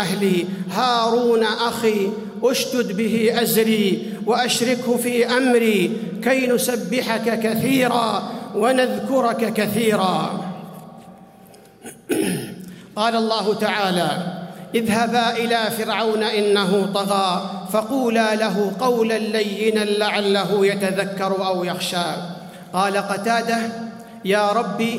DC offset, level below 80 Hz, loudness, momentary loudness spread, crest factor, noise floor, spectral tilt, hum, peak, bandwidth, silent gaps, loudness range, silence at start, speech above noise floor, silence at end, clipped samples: under 0.1%; -64 dBFS; -20 LUFS; 9 LU; 16 dB; -46 dBFS; -4.5 dB/octave; none; -4 dBFS; 16 kHz; none; 4 LU; 0 s; 27 dB; 0 s; under 0.1%